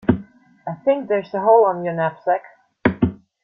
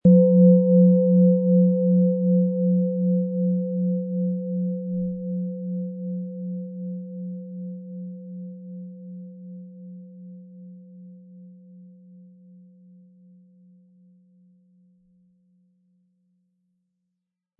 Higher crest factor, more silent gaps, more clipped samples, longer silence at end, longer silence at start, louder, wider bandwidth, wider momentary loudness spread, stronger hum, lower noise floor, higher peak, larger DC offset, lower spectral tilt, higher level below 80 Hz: about the same, 18 dB vs 18 dB; neither; neither; second, 0.3 s vs 5.75 s; about the same, 0.05 s vs 0.05 s; about the same, -20 LUFS vs -21 LUFS; first, 5.6 kHz vs 1 kHz; second, 10 LU vs 25 LU; neither; second, -42 dBFS vs -83 dBFS; first, -2 dBFS vs -6 dBFS; neither; second, -10.5 dB/octave vs -17 dB/octave; first, -48 dBFS vs -66 dBFS